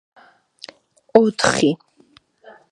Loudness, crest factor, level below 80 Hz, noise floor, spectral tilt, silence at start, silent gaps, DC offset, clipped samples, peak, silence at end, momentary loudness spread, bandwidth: -18 LUFS; 22 dB; -58 dBFS; -55 dBFS; -4 dB/octave; 1.15 s; none; under 0.1%; under 0.1%; 0 dBFS; 0.95 s; 24 LU; 11.5 kHz